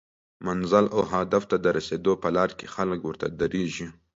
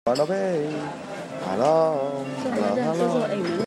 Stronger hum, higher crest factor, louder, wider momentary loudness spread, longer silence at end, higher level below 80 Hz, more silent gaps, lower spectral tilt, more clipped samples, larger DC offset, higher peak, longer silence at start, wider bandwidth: neither; about the same, 20 dB vs 16 dB; about the same, -26 LUFS vs -24 LUFS; about the same, 10 LU vs 11 LU; first, 0.25 s vs 0 s; first, -54 dBFS vs -68 dBFS; neither; about the same, -6 dB/octave vs -6 dB/octave; neither; neither; about the same, -6 dBFS vs -8 dBFS; first, 0.4 s vs 0.05 s; second, 8 kHz vs 13 kHz